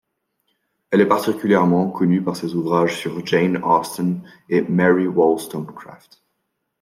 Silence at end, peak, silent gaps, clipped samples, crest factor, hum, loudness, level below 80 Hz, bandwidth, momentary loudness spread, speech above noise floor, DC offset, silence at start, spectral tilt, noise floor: 0.85 s; -2 dBFS; none; under 0.1%; 18 dB; none; -19 LUFS; -64 dBFS; 16 kHz; 10 LU; 56 dB; under 0.1%; 0.9 s; -6.5 dB/octave; -74 dBFS